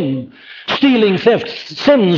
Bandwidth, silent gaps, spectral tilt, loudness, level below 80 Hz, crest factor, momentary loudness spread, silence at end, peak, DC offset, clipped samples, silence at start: 7 kHz; none; -6.5 dB/octave; -14 LUFS; -56 dBFS; 14 dB; 14 LU; 0 s; 0 dBFS; under 0.1%; under 0.1%; 0 s